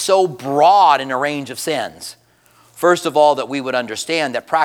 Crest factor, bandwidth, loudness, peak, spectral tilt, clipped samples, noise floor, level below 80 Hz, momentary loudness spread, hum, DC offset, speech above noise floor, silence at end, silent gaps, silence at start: 16 dB; 18 kHz; -16 LUFS; 0 dBFS; -3.5 dB/octave; under 0.1%; -53 dBFS; -68 dBFS; 11 LU; none; under 0.1%; 37 dB; 0 s; none; 0 s